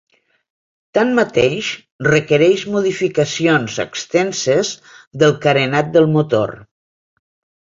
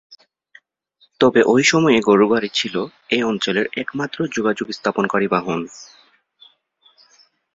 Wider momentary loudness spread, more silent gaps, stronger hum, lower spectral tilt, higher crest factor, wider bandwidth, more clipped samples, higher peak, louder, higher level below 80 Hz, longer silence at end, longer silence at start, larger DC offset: second, 9 LU vs 12 LU; first, 1.91-1.99 s, 5.07-5.11 s vs none; neither; about the same, -5 dB/octave vs -4.5 dB/octave; about the same, 16 dB vs 18 dB; about the same, 7.8 kHz vs 7.8 kHz; neither; about the same, -2 dBFS vs -2 dBFS; about the same, -16 LUFS vs -18 LUFS; first, -54 dBFS vs -60 dBFS; second, 1.1 s vs 1.7 s; first, 0.95 s vs 0.1 s; neither